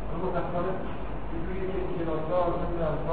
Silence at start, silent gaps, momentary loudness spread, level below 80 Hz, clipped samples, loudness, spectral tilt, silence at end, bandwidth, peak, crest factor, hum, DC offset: 0 s; none; 8 LU; -38 dBFS; under 0.1%; -31 LUFS; -11.5 dB/octave; 0 s; 4.7 kHz; -14 dBFS; 16 dB; none; 2%